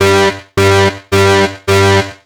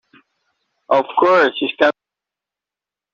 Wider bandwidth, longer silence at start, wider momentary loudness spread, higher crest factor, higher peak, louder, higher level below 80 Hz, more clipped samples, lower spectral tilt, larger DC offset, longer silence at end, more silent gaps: first, 19.5 kHz vs 7.2 kHz; second, 0 s vs 0.9 s; about the same, 3 LU vs 5 LU; second, 10 dB vs 18 dB; about the same, 0 dBFS vs -2 dBFS; first, -10 LUFS vs -16 LUFS; first, -42 dBFS vs -68 dBFS; neither; about the same, -4.5 dB/octave vs -5 dB/octave; neither; second, 0.1 s vs 1.25 s; neither